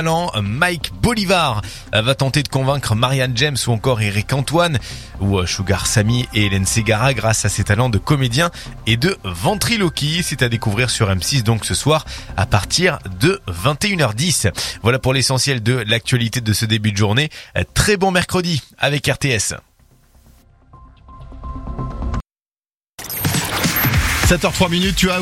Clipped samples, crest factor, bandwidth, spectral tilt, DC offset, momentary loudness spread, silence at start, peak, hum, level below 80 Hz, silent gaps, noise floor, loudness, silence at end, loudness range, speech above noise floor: under 0.1%; 18 dB; 16.5 kHz; -4 dB/octave; under 0.1%; 7 LU; 0 s; 0 dBFS; none; -34 dBFS; 22.89-22.93 s; under -90 dBFS; -17 LUFS; 0 s; 6 LU; over 73 dB